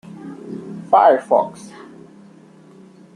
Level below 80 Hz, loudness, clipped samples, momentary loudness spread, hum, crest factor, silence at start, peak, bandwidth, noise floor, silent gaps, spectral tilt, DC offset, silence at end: -68 dBFS; -15 LUFS; under 0.1%; 25 LU; none; 20 dB; 0.25 s; -2 dBFS; 10.5 kHz; -45 dBFS; none; -6 dB/octave; under 0.1%; 1.65 s